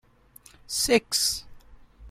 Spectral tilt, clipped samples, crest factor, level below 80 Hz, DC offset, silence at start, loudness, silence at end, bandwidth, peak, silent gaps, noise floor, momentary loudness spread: -1.5 dB/octave; under 0.1%; 24 dB; -52 dBFS; under 0.1%; 0.7 s; -24 LUFS; 0 s; 16 kHz; -6 dBFS; none; -55 dBFS; 10 LU